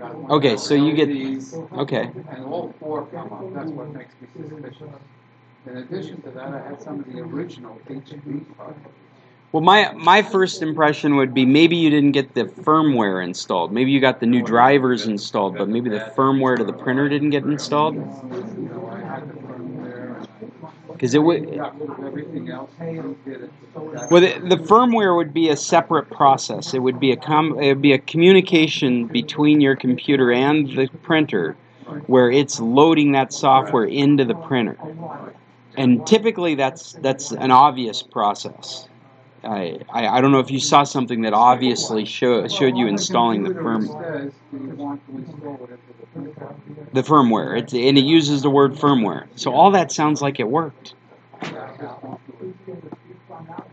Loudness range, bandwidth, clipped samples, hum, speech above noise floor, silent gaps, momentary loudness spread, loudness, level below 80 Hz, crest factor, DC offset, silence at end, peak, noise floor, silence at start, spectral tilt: 16 LU; 8.6 kHz; under 0.1%; none; 31 dB; none; 21 LU; -17 LUFS; -72 dBFS; 18 dB; under 0.1%; 0.1 s; 0 dBFS; -49 dBFS; 0 s; -5 dB/octave